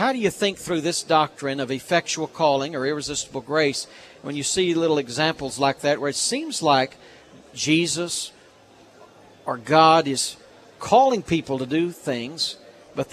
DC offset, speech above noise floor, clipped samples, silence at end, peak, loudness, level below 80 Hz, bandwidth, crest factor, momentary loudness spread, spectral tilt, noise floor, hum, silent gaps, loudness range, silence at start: under 0.1%; 29 dB; under 0.1%; 0.05 s; -2 dBFS; -22 LUFS; -60 dBFS; 14 kHz; 22 dB; 13 LU; -3.5 dB/octave; -51 dBFS; none; none; 3 LU; 0 s